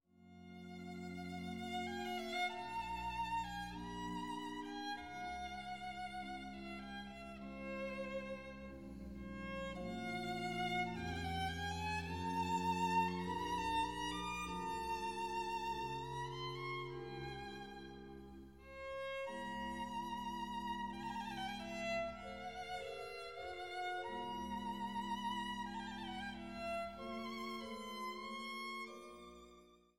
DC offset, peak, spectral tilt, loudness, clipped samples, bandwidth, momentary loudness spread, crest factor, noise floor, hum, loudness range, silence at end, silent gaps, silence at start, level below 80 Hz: under 0.1%; -24 dBFS; -4.5 dB/octave; -44 LUFS; under 0.1%; 17 kHz; 11 LU; 20 dB; -65 dBFS; none; 8 LU; 0 s; none; 0 s; -62 dBFS